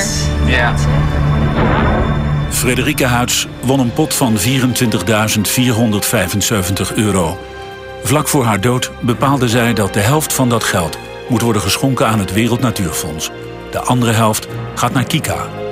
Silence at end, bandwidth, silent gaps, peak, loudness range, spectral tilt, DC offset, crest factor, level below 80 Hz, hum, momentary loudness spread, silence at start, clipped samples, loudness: 0 s; 16 kHz; none; -2 dBFS; 2 LU; -4.5 dB/octave; under 0.1%; 12 dB; -28 dBFS; none; 8 LU; 0 s; under 0.1%; -14 LUFS